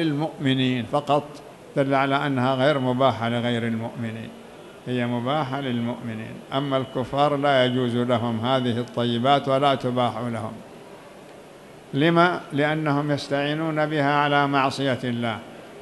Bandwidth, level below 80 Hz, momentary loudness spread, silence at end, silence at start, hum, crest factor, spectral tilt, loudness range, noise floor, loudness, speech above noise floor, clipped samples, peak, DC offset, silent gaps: 12 kHz; -62 dBFS; 14 LU; 0 s; 0 s; none; 20 dB; -6.5 dB/octave; 4 LU; -45 dBFS; -23 LUFS; 22 dB; under 0.1%; -4 dBFS; under 0.1%; none